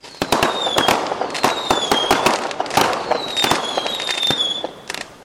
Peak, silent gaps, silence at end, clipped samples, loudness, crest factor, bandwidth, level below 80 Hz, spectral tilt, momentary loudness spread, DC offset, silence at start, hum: -4 dBFS; none; 0 s; under 0.1%; -18 LUFS; 16 dB; 17 kHz; -48 dBFS; -2 dB/octave; 6 LU; under 0.1%; 0.05 s; none